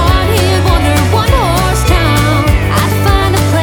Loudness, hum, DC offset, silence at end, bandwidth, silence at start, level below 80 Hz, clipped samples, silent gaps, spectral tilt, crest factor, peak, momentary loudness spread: -10 LUFS; none; under 0.1%; 0 s; 19.5 kHz; 0 s; -16 dBFS; under 0.1%; none; -5 dB/octave; 10 dB; 0 dBFS; 1 LU